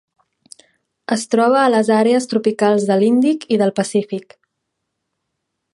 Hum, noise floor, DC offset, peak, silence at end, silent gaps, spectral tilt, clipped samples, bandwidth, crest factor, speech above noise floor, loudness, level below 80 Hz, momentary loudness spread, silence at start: none; -76 dBFS; under 0.1%; -2 dBFS; 1.55 s; none; -5.5 dB/octave; under 0.1%; 11.5 kHz; 16 dB; 60 dB; -16 LUFS; -70 dBFS; 9 LU; 1.1 s